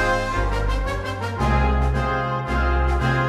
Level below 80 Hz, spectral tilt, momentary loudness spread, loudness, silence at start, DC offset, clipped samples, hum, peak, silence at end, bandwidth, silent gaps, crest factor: -24 dBFS; -6.5 dB/octave; 5 LU; -22 LUFS; 0 s; under 0.1%; under 0.1%; none; -8 dBFS; 0 s; 11 kHz; none; 12 dB